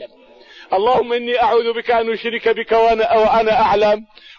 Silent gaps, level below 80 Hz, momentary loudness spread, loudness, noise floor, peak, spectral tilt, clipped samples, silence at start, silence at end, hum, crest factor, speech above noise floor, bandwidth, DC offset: none; -46 dBFS; 5 LU; -16 LUFS; -45 dBFS; -6 dBFS; -5 dB/octave; under 0.1%; 0 s; 0.35 s; none; 12 dB; 30 dB; 6.8 kHz; under 0.1%